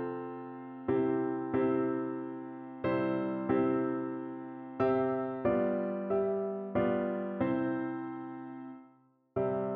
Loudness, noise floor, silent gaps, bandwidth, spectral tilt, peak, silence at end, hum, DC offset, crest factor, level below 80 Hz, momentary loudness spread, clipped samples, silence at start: -33 LUFS; -65 dBFS; none; 4.5 kHz; -7.5 dB/octave; -16 dBFS; 0 s; none; under 0.1%; 16 dB; -66 dBFS; 13 LU; under 0.1%; 0 s